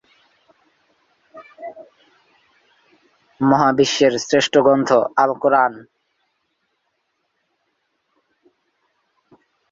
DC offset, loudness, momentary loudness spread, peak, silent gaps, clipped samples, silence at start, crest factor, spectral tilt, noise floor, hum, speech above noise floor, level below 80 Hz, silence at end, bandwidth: under 0.1%; -16 LUFS; 22 LU; -2 dBFS; none; under 0.1%; 1.35 s; 20 dB; -4.5 dB/octave; -71 dBFS; none; 55 dB; -64 dBFS; 3.95 s; 7.8 kHz